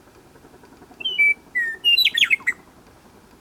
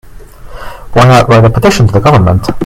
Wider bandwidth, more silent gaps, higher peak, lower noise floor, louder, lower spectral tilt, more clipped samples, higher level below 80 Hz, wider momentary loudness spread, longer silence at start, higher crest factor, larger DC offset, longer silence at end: first, 19.5 kHz vs 15 kHz; neither; second, -6 dBFS vs 0 dBFS; first, -50 dBFS vs -28 dBFS; second, -18 LUFS vs -6 LUFS; second, 0.5 dB/octave vs -6.5 dB/octave; second, under 0.1% vs 3%; second, -62 dBFS vs -26 dBFS; about the same, 12 LU vs 12 LU; first, 1 s vs 0.15 s; first, 18 dB vs 8 dB; neither; first, 0.9 s vs 0 s